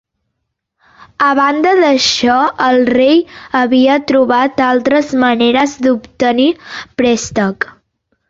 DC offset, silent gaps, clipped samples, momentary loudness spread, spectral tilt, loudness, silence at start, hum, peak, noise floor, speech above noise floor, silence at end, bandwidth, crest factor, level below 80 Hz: under 0.1%; none; under 0.1%; 6 LU; -4 dB/octave; -12 LUFS; 1.2 s; none; 0 dBFS; -72 dBFS; 61 dB; 0.65 s; 7.8 kHz; 12 dB; -50 dBFS